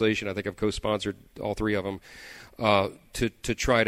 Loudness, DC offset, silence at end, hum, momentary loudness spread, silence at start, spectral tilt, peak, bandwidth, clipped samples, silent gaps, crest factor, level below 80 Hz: -28 LUFS; under 0.1%; 0 s; none; 15 LU; 0 s; -4.5 dB/octave; -8 dBFS; 16 kHz; under 0.1%; none; 20 dB; -44 dBFS